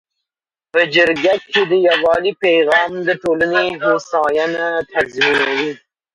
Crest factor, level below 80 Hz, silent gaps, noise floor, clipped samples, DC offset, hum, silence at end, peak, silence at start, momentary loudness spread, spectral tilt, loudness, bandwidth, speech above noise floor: 16 dB; -56 dBFS; none; -88 dBFS; under 0.1%; under 0.1%; none; 0.4 s; 0 dBFS; 0.75 s; 6 LU; -4 dB/octave; -15 LUFS; 11 kHz; 73 dB